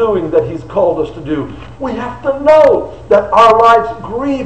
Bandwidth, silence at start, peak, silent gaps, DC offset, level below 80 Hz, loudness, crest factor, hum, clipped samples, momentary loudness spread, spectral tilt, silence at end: 8.8 kHz; 0 s; 0 dBFS; none; 0.9%; -38 dBFS; -12 LUFS; 12 dB; none; under 0.1%; 13 LU; -6.5 dB/octave; 0 s